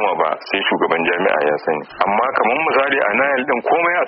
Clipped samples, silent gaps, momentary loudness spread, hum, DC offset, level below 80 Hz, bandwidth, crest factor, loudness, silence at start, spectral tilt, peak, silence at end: under 0.1%; none; 4 LU; none; under 0.1%; -60 dBFS; 5.8 kHz; 14 dB; -17 LUFS; 0 s; -1 dB/octave; -2 dBFS; 0 s